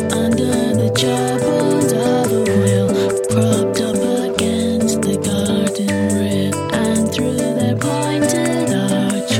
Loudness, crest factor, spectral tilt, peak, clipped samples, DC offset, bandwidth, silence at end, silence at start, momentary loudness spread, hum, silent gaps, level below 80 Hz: -17 LUFS; 16 dB; -5 dB/octave; 0 dBFS; under 0.1%; under 0.1%; 16.5 kHz; 0 s; 0 s; 3 LU; none; none; -50 dBFS